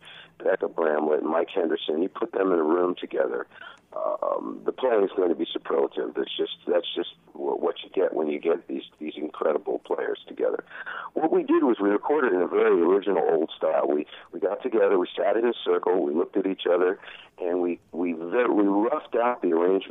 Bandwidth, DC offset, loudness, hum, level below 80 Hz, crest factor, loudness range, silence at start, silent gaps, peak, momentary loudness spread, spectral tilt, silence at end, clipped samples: 3.9 kHz; under 0.1%; -25 LUFS; none; -78 dBFS; 16 dB; 5 LU; 0.05 s; none; -8 dBFS; 10 LU; -7.5 dB/octave; 0 s; under 0.1%